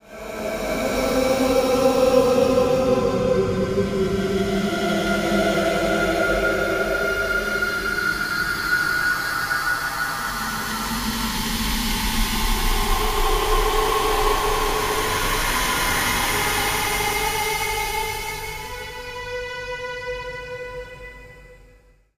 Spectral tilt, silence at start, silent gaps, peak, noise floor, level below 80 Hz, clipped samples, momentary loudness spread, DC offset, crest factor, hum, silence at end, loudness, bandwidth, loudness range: -3.5 dB/octave; 0.05 s; none; -4 dBFS; -53 dBFS; -32 dBFS; under 0.1%; 11 LU; under 0.1%; 18 dB; none; 0.6 s; -21 LUFS; 16 kHz; 7 LU